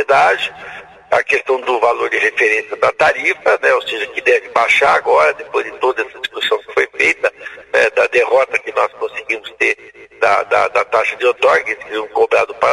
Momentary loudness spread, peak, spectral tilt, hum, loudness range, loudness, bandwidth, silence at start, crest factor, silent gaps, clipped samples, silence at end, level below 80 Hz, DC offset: 9 LU; 0 dBFS; -2.5 dB/octave; none; 2 LU; -15 LUFS; 12 kHz; 0 s; 14 dB; none; under 0.1%; 0 s; -56 dBFS; under 0.1%